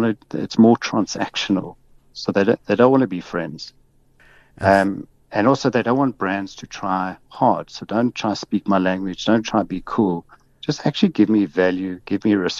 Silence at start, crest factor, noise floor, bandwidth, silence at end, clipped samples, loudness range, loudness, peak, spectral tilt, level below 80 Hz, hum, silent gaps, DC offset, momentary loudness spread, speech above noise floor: 0 s; 18 dB; -54 dBFS; 10.5 kHz; 0 s; under 0.1%; 3 LU; -20 LUFS; -2 dBFS; -6 dB/octave; -54 dBFS; none; none; under 0.1%; 12 LU; 34 dB